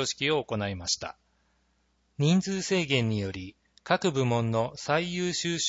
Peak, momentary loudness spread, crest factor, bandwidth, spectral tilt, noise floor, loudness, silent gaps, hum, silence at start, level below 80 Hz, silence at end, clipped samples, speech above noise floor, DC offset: -8 dBFS; 9 LU; 20 dB; 8 kHz; -4.5 dB/octave; -70 dBFS; -28 LUFS; none; none; 0 s; -60 dBFS; 0 s; under 0.1%; 43 dB; under 0.1%